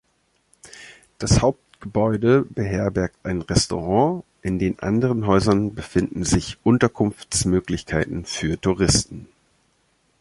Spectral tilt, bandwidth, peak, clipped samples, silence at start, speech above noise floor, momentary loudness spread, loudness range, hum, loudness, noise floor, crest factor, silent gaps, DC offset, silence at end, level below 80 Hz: -5 dB/octave; 11.5 kHz; -2 dBFS; under 0.1%; 0.65 s; 46 dB; 10 LU; 2 LU; none; -21 LUFS; -66 dBFS; 20 dB; none; under 0.1%; 0.95 s; -38 dBFS